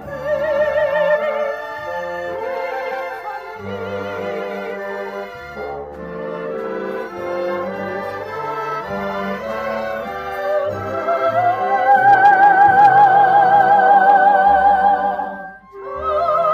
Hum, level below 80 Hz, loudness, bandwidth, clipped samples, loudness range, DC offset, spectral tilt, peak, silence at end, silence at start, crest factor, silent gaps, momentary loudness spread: none; -52 dBFS; -16 LUFS; 14 kHz; under 0.1%; 15 LU; under 0.1%; -6 dB/octave; -2 dBFS; 0 s; 0 s; 14 dB; none; 18 LU